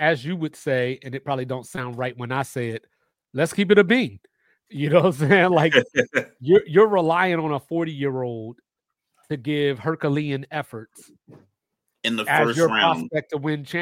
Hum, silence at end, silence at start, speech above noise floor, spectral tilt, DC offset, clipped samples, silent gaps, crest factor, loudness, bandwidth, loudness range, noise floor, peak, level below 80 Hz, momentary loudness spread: none; 0 s; 0 s; 61 dB; -6 dB/octave; under 0.1%; under 0.1%; none; 20 dB; -21 LUFS; 16 kHz; 9 LU; -82 dBFS; -2 dBFS; -64 dBFS; 14 LU